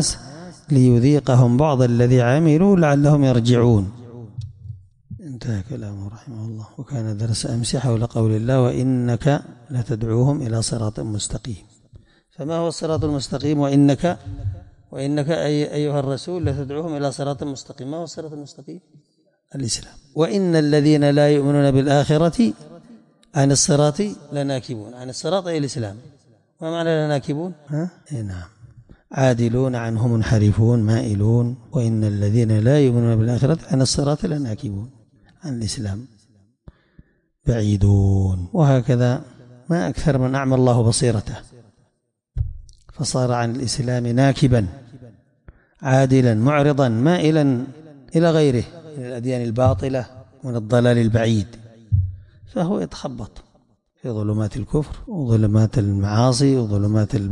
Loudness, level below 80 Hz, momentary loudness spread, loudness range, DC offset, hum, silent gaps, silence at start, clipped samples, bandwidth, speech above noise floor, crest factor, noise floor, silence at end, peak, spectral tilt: -19 LUFS; -42 dBFS; 17 LU; 8 LU; under 0.1%; none; none; 0 s; under 0.1%; 11 kHz; 52 dB; 14 dB; -70 dBFS; 0 s; -6 dBFS; -6.5 dB/octave